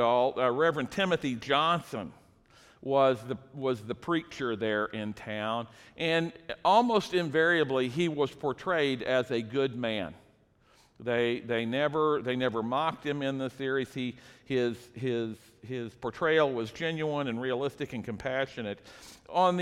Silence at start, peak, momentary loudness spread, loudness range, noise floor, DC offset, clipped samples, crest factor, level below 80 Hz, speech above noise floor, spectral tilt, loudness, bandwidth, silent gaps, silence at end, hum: 0 s; -10 dBFS; 12 LU; 5 LU; -64 dBFS; under 0.1%; under 0.1%; 20 dB; -66 dBFS; 34 dB; -6 dB/octave; -30 LUFS; 14 kHz; none; 0 s; none